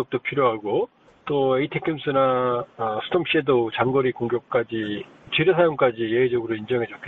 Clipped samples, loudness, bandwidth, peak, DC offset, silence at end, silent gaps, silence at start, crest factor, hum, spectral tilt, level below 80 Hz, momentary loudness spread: under 0.1%; -23 LUFS; 4.2 kHz; -6 dBFS; under 0.1%; 0 s; none; 0 s; 16 dB; none; -8.5 dB/octave; -60 dBFS; 7 LU